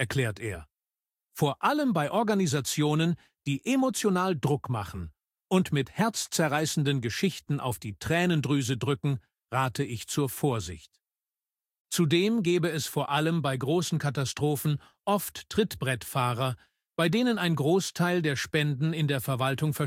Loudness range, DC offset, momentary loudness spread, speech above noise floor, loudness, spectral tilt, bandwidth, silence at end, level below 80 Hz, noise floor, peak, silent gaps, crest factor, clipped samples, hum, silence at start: 2 LU; under 0.1%; 8 LU; over 63 dB; -28 LUFS; -5 dB/octave; 16.5 kHz; 0 s; -58 dBFS; under -90 dBFS; -10 dBFS; 11.80-11.85 s; 18 dB; under 0.1%; none; 0 s